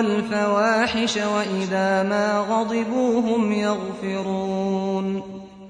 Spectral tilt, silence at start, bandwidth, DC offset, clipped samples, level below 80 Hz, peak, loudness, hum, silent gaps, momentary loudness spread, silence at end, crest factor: -5 dB/octave; 0 s; 10.5 kHz; under 0.1%; under 0.1%; -58 dBFS; -8 dBFS; -22 LUFS; none; none; 7 LU; 0 s; 14 dB